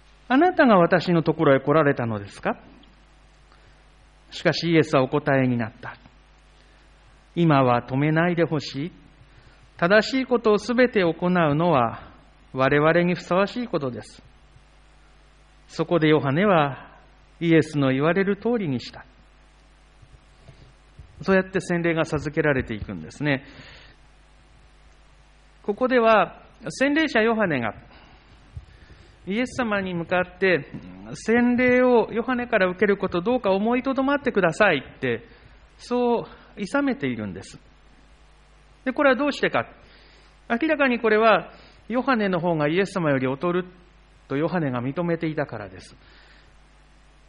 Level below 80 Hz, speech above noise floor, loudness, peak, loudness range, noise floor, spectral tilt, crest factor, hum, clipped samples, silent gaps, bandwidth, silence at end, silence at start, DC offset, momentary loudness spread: -52 dBFS; 31 dB; -22 LUFS; -6 dBFS; 7 LU; -53 dBFS; -6.5 dB/octave; 18 dB; none; under 0.1%; none; 10 kHz; 1.45 s; 0.3 s; under 0.1%; 14 LU